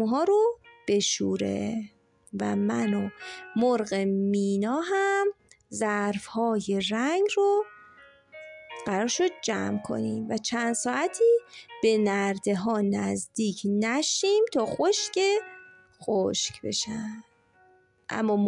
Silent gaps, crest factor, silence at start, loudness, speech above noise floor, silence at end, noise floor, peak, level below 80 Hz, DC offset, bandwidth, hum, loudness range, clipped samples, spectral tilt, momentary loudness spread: none; 14 dB; 0 s; -27 LUFS; 35 dB; 0 s; -61 dBFS; -12 dBFS; -70 dBFS; under 0.1%; 11 kHz; none; 3 LU; under 0.1%; -4 dB/octave; 13 LU